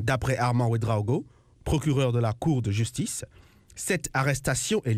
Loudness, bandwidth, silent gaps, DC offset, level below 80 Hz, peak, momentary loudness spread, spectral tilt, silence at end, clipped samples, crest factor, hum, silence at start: -27 LUFS; 15.5 kHz; none; under 0.1%; -44 dBFS; -10 dBFS; 10 LU; -5.5 dB/octave; 0 s; under 0.1%; 16 dB; none; 0 s